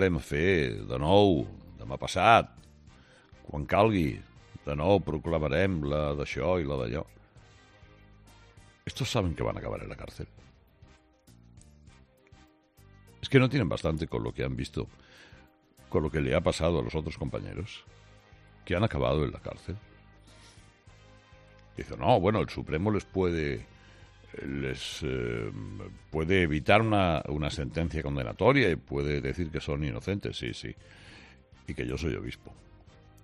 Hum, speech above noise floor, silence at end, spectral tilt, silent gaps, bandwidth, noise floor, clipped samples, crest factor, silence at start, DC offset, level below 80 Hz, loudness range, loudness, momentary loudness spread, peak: none; 30 dB; 0.7 s; -6.5 dB/octave; none; 13 kHz; -59 dBFS; under 0.1%; 24 dB; 0 s; under 0.1%; -46 dBFS; 9 LU; -29 LUFS; 19 LU; -6 dBFS